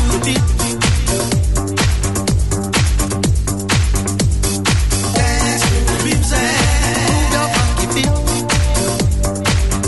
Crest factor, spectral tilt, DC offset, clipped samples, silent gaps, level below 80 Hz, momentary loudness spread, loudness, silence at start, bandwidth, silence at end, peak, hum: 14 dB; -4 dB/octave; 1%; under 0.1%; none; -20 dBFS; 2 LU; -15 LUFS; 0 s; 12 kHz; 0 s; -2 dBFS; none